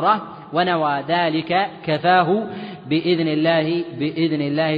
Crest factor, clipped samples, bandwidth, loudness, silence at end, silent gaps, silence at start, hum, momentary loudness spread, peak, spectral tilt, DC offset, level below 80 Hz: 16 dB; under 0.1%; 5.2 kHz; -20 LUFS; 0 s; none; 0 s; none; 7 LU; -4 dBFS; -9 dB/octave; under 0.1%; -64 dBFS